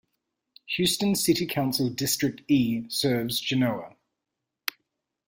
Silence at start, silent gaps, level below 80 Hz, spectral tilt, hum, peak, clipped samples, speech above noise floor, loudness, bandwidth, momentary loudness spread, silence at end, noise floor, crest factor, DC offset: 0.7 s; none; -60 dBFS; -4 dB/octave; none; -8 dBFS; under 0.1%; 59 dB; -26 LUFS; 16.5 kHz; 11 LU; 0.55 s; -85 dBFS; 20 dB; under 0.1%